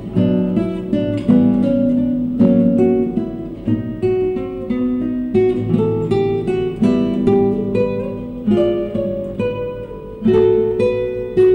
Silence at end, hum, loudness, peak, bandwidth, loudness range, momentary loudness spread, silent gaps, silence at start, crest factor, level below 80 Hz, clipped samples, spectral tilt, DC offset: 0 s; none; -17 LUFS; -4 dBFS; 5.4 kHz; 3 LU; 9 LU; none; 0 s; 12 dB; -40 dBFS; under 0.1%; -9.5 dB/octave; under 0.1%